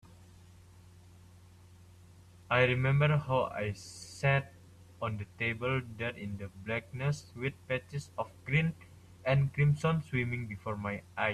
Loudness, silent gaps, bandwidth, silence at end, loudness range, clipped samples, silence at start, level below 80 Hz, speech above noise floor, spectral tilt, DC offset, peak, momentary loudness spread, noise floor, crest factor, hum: -33 LUFS; none; 11.5 kHz; 0 s; 5 LU; under 0.1%; 0.2 s; -60 dBFS; 24 dB; -6.5 dB/octave; under 0.1%; -14 dBFS; 13 LU; -56 dBFS; 20 dB; none